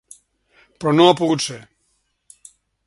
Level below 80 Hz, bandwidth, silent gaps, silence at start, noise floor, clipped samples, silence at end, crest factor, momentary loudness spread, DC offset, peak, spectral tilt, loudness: -62 dBFS; 11.5 kHz; none; 0.8 s; -68 dBFS; under 0.1%; 1.25 s; 22 dB; 13 LU; under 0.1%; 0 dBFS; -5 dB/octave; -17 LUFS